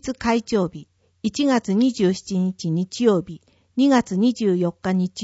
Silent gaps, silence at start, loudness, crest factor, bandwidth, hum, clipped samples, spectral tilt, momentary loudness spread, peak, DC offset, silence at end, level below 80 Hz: none; 0.05 s; -21 LUFS; 16 dB; 8 kHz; none; under 0.1%; -6 dB/octave; 8 LU; -4 dBFS; under 0.1%; 0 s; -54 dBFS